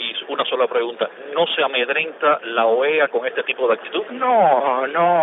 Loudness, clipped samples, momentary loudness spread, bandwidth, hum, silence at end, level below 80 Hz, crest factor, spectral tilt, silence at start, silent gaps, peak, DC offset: -19 LUFS; under 0.1%; 7 LU; 4 kHz; none; 0 s; under -90 dBFS; 16 dB; -7.5 dB/octave; 0 s; none; -4 dBFS; under 0.1%